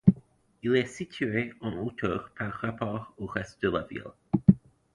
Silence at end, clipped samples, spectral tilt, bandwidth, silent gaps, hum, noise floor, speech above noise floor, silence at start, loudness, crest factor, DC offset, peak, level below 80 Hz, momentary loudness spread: 0.35 s; under 0.1%; -7.5 dB/octave; 10.5 kHz; none; none; -55 dBFS; 24 dB; 0.05 s; -30 LUFS; 24 dB; under 0.1%; -4 dBFS; -52 dBFS; 12 LU